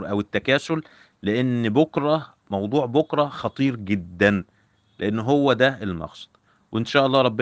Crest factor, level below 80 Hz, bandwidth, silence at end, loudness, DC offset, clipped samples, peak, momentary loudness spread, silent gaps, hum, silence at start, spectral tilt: 20 dB; -58 dBFS; 9 kHz; 0 s; -22 LUFS; under 0.1%; under 0.1%; -4 dBFS; 11 LU; none; none; 0 s; -6.5 dB/octave